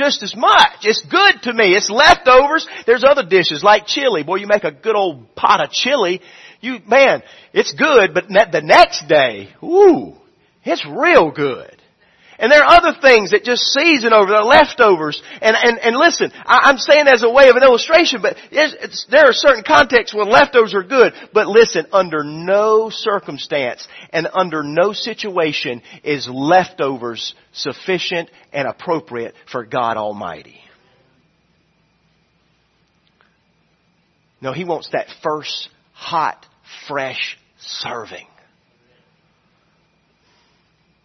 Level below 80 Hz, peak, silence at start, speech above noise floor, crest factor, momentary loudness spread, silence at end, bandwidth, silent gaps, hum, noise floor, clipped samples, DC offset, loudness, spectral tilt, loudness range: -50 dBFS; 0 dBFS; 0 s; 47 dB; 14 dB; 16 LU; 2.85 s; 10.5 kHz; none; none; -61 dBFS; under 0.1%; under 0.1%; -13 LUFS; -3 dB/octave; 15 LU